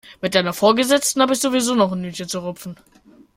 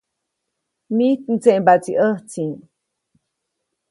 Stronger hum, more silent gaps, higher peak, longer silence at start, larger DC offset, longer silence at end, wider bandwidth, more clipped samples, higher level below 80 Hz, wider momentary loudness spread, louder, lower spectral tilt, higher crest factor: neither; neither; about the same, -2 dBFS vs 0 dBFS; second, 0.05 s vs 0.9 s; neither; second, 0.6 s vs 1.35 s; first, 16.5 kHz vs 11.5 kHz; neither; first, -58 dBFS vs -68 dBFS; about the same, 12 LU vs 12 LU; about the same, -18 LUFS vs -18 LUFS; second, -3.5 dB/octave vs -6.5 dB/octave; about the same, 18 dB vs 20 dB